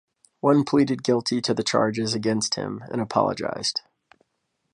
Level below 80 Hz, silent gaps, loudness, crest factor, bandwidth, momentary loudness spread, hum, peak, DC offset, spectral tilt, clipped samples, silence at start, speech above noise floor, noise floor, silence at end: -62 dBFS; none; -24 LUFS; 20 dB; 11.5 kHz; 7 LU; none; -4 dBFS; under 0.1%; -4.5 dB/octave; under 0.1%; 0.45 s; 53 dB; -76 dBFS; 0.95 s